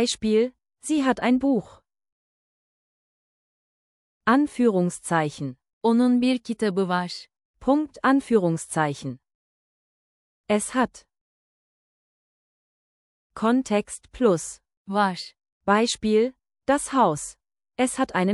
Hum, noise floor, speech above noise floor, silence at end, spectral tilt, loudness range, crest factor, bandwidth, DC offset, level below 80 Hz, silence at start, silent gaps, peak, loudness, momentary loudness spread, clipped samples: none; under -90 dBFS; over 67 dB; 0 s; -5 dB/octave; 8 LU; 18 dB; 12 kHz; under 0.1%; -58 dBFS; 0 s; 2.12-4.21 s, 5.73-5.81 s, 7.45-7.54 s, 9.35-10.44 s, 11.21-13.30 s, 14.77-14.85 s, 15.52-15.61 s; -6 dBFS; -23 LUFS; 14 LU; under 0.1%